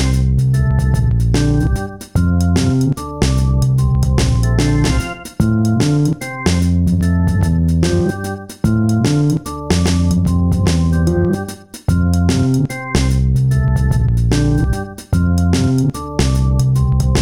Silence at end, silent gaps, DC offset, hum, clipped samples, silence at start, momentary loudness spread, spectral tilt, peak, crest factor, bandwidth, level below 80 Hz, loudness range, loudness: 0 s; none; 0.7%; none; under 0.1%; 0 s; 5 LU; -6.5 dB/octave; 0 dBFS; 14 dB; 15.5 kHz; -22 dBFS; 1 LU; -15 LUFS